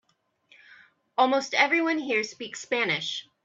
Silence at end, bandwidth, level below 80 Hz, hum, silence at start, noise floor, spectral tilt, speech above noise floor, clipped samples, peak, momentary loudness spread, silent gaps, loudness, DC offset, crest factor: 0.2 s; 8 kHz; -78 dBFS; none; 1.2 s; -67 dBFS; -3 dB/octave; 41 dB; under 0.1%; -6 dBFS; 11 LU; none; -25 LUFS; under 0.1%; 22 dB